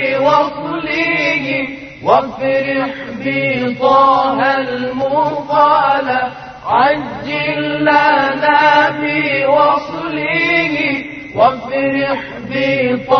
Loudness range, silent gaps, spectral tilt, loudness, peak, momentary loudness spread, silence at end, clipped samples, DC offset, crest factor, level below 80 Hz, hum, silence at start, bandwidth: 3 LU; none; -6 dB/octave; -14 LUFS; 0 dBFS; 9 LU; 0 s; under 0.1%; under 0.1%; 14 dB; -50 dBFS; none; 0 s; 6.4 kHz